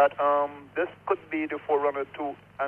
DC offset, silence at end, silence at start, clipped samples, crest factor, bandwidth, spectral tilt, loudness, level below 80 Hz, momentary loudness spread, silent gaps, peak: under 0.1%; 0 s; 0 s; under 0.1%; 18 dB; 4 kHz; -7 dB/octave; -28 LUFS; -70 dBFS; 9 LU; none; -10 dBFS